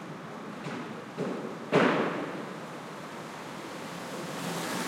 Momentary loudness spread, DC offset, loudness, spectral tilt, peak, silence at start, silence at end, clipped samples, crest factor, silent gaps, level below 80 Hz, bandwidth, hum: 15 LU; under 0.1%; -33 LUFS; -5 dB/octave; -12 dBFS; 0 s; 0 s; under 0.1%; 22 dB; none; -78 dBFS; 16.5 kHz; none